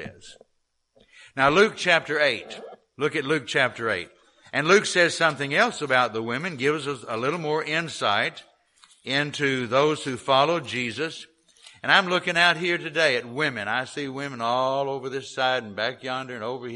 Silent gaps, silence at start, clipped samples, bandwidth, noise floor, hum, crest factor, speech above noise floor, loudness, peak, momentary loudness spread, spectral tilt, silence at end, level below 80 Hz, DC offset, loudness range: none; 0 s; under 0.1%; 11.5 kHz; -72 dBFS; none; 22 dB; 48 dB; -23 LUFS; -2 dBFS; 12 LU; -3.5 dB/octave; 0 s; -64 dBFS; under 0.1%; 3 LU